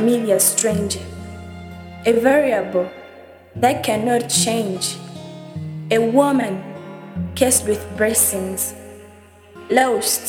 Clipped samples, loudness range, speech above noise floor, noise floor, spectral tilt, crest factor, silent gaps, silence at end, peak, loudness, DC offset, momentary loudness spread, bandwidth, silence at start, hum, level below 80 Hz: under 0.1%; 2 LU; 27 dB; -45 dBFS; -3.5 dB/octave; 18 dB; none; 0 s; -2 dBFS; -18 LUFS; under 0.1%; 20 LU; 19 kHz; 0 s; none; -50 dBFS